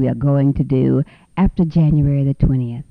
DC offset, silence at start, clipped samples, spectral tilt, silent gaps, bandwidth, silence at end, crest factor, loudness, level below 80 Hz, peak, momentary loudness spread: under 0.1%; 0 s; under 0.1%; -11.5 dB/octave; none; 4.8 kHz; 0.1 s; 12 dB; -17 LUFS; -30 dBFS; -4 dBFS; 5 LU